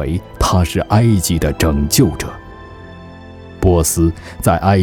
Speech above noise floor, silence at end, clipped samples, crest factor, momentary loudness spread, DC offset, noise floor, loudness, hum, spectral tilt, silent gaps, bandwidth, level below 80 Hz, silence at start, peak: 21 dB; 0 s; under 0.1%; 16 dB; 22 LU; under 0.1%; -35 dBFS; -15 LUFS; none; -5.5 dB/octave; none; 19.5 kHz; -26 dBFS; 0 s; 0 dBFS